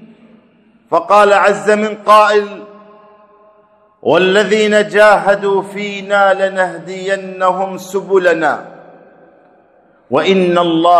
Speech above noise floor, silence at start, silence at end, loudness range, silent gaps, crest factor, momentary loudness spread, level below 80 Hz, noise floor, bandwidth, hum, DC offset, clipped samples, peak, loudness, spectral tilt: 38 dB; 0 s; 0 s; 5 LU; none; 14 dB; 12 LU; -60 dBFS; -50 dBFS; 13.5 kHz; none; under 0.1%; 0.3%; 0 dBFS; -12 LUFS; -4.5 dB/octave